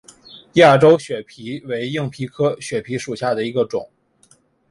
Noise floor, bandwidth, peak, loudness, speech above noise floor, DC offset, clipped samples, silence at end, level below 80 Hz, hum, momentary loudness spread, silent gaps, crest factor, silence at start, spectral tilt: -56 dBFS; 11.5 kHz; -2 dBFS; -18 LUFS; 39 dB; under 0.1%; under 0.1%; 0.85 s; -58 dBFS; none; 17 LU; none; 18 dB; 0.35 s; -6 dB/octave